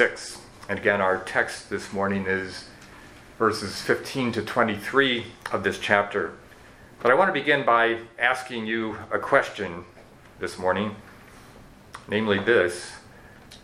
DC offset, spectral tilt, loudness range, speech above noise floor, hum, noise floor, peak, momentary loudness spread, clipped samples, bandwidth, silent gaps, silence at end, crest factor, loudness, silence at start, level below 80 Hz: under 0.1%; -4.5 dB/octave; 5 LU; 24 dB; none; -49 dBFS; -2 dBFS; 16 LU; under 0.1%; 15.5 kHz; none; 0.05 s; 24 dB; -24 LUFS; 0 s; -58 dBFS